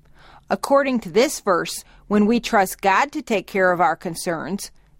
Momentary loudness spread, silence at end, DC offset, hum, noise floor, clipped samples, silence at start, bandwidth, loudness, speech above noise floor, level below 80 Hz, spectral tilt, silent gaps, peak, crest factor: 9 LU; 0.3 s; under 0.1%; none; -48 dBFS; under 0.1%; 0.5 s; 16.5 kHz; -20 LUFS; 28 dB; -52 dBFS; -4.5 dB/octave; none; -4 dBFS; 16 dB